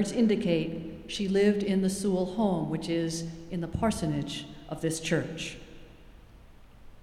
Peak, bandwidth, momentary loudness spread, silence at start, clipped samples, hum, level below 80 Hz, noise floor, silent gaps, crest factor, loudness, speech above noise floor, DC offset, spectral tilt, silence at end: -12 dBFS; 14.5 kHz; 12 LU; 0 s; under 0.1%; none; -50 dBFS; -52 dBFS; none; 18 dB; -29 LUFS; 23 dB; under 0.1%; -5.5 dB/octave; 0 s